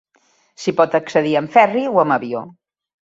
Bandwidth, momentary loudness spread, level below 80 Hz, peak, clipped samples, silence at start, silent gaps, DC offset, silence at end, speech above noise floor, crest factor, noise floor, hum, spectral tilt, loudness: 7.8 kHz; 11 LU; -66 dBFS; 0 dBFS; under 0.1%; 0.6 s; none; under 0.1%; 0.65 s; 44 dB; 18 dB; -60 dBFS; none; -6 dB/octave; -17 LUFS